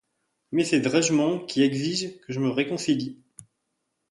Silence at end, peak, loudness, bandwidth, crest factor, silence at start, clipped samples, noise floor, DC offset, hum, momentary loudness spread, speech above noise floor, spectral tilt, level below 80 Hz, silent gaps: 0.7 s; -8 dBFS; -25 LUFS; 11.5 kHz; 18 dB; 0.5 s; under 0.1%; -78 dBFS; under 0.1%; none; 8 LU; 54 dB; -4.5 dB/octave; -68 dBFS; none